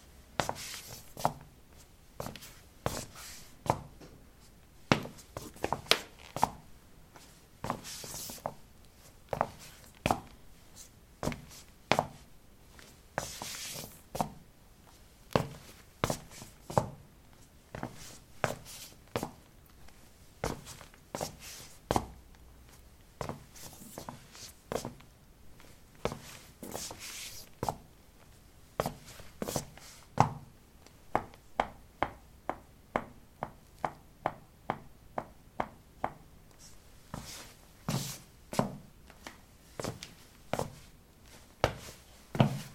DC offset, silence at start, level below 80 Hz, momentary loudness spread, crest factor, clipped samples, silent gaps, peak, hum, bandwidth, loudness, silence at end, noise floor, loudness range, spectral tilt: under 0.1%; 0 s; -56 dBFS; 23 LU; 38 dB; under 0.1%; none; -2 dBFS; none; 16.5 kHz; -38 LUFS; 0 s; -58 dBFS; 7 LU; -4 dB/octave